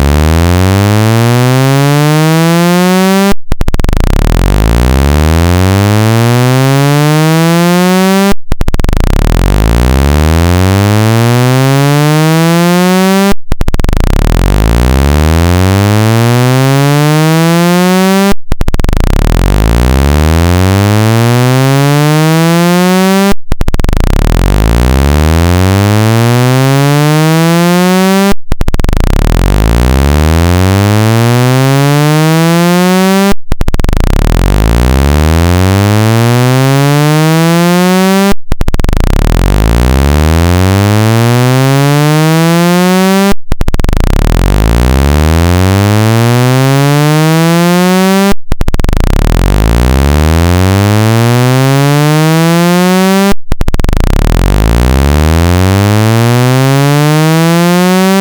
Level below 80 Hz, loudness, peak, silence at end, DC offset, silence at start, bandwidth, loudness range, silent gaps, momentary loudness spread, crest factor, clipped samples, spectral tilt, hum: -12 dBFS; -8 LUFS; 0 dBFS; 0 s; under 0.1%; 0 s; over 20 kHz; 2 LU; none; 5 LU; 6 dB; under 0.1%; -6 dB/octave; none